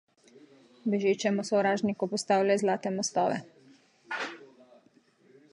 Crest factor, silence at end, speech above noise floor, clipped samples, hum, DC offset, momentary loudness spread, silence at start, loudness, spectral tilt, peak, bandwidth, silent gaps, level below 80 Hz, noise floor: 18 dB; 1.05 s; 36 dB; under 0.1%; none; under 0.1%; 11 LU; 0.85 s; -29 LUFS; -4.5 dB/octave; -12 dBFS; 11.5 kHz; none; -80 dBFS; -64 dBFS